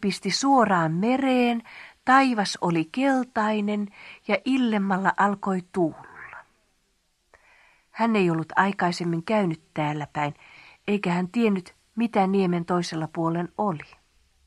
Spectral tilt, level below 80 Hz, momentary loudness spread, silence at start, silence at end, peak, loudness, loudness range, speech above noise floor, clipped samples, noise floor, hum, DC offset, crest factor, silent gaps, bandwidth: -5.5 dB/octave; -66 dBFS; 11 LU; 0 s; 0.65 s; -6 dBFS; -24 LUFS; 5 LU; 46 dB; under 0.1%; -70 dBFS; none; under 0.1%; 20 dB; none; 12 kHz